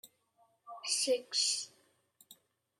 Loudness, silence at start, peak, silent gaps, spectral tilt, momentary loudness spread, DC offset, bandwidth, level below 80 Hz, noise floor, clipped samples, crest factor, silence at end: -33 LUFS; 0.05 s; -18 dBFS; none; 1.5 dB/octave; 16 LU; under 0.1%; 15.5 kHz; under -90 dBFS; -72 dBFS; under 0.1%; 20 dB; 0.45 s